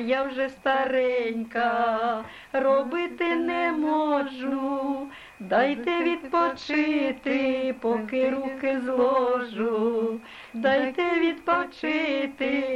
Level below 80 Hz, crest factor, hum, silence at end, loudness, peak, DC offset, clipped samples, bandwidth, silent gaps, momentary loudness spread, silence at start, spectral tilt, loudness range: -62 dBFS; 16 dB; none; 0 s; -25 LUFS; -10 dBFS; under 0.1%; under 0.1%; 11 kHz; none; 6 LU; 0 s; -5.5 dB/octave; 1 LU